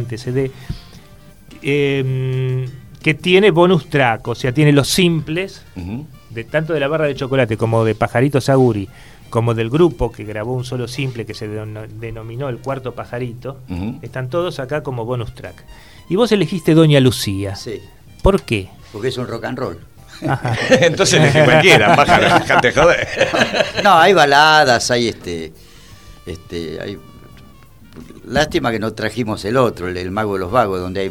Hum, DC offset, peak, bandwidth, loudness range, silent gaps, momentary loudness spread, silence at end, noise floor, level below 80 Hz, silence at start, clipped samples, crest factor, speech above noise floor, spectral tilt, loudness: none; 0.4%; 0 dBFS; 16.5 kHz; 13 LU; none; 18 LU; 0 s; -43 dBFS; -38 dBFS; 0 s; under 0.1%; 16 dB; 28 dB; -5 dB/octave; -15 LUFS